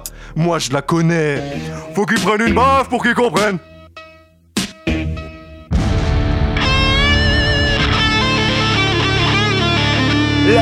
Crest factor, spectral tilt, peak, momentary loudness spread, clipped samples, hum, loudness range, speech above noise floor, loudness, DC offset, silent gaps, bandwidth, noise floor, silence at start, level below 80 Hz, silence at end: 16 dB; -5 dB/octave; 0 dBFS; 10 LU; under 0.1%; none; 6 LU; 30 dB; -15 LUFS; under 0.1%; none; 15 kHz; -45 dBFS; 0 s; -24 dBFS; 0 s